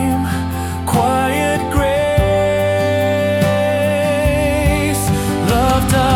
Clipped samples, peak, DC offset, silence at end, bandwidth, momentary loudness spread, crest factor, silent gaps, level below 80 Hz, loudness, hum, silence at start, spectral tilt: under 0.1%; -4 dBFS; under 0.1%; 0 s; 18.5 kHz; 3 LU; 12 dB; none; -28 dBFS; -16 LUFS; none; 0 s; -5.5 dB/octave